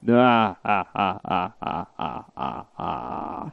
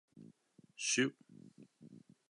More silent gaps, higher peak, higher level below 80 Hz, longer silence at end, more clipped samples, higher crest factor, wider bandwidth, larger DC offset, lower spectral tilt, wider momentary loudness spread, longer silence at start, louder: neither; first, -6 dBFS vs -20 dBFS; first, -56 dBFS vs under -90 dBFS; second, 0 s vs 0.3 s; neither; about the same, 18 dB vs 22 dB; second, 5.8 kHz vs 11 kHz; neither; first, -8 dB/octave vs -2.5 dB/octave; second, 14 LU vs 26 LU; second, 0 s vs 0.15 s; first, -25 LUFS vs -36 LUFS